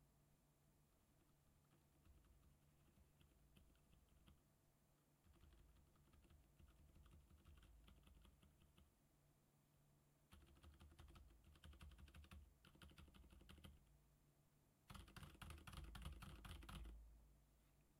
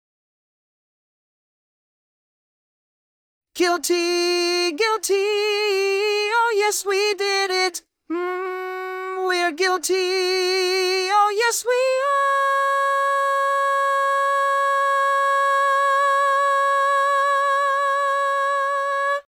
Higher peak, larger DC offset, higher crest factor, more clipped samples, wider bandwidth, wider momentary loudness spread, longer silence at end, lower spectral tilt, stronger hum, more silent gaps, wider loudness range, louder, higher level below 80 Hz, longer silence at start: second, -42 dBFS vs -8 dBFS; neither; first, 24 dB vs 14 dB; neither; second, 16.5 kHz vs 20 kHz; first, 10 LU vs 5 LU; about the same, 0 s vs 0.1 s; first, -4.5 dB/octave vs 1 dB/octave; neither; neither; first, 7 LU vs 4 LU; second, -64 LUFS vs -20 LUFS; first, -70 dBFS vs -78 dBFS; second, 0 s vs 3.55 s